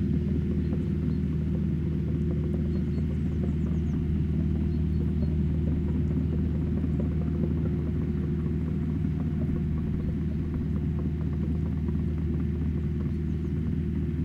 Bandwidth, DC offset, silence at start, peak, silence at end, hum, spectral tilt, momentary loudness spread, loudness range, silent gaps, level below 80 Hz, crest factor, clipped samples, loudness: 4.5 kHz; under 0.1%; 0 s; -14 dBFS; 0 s; none; -10.5 dB/octave; 2 LU; 2 LU; none; -34 dBFS; 14 dB; under 0.1%; -29 LUFS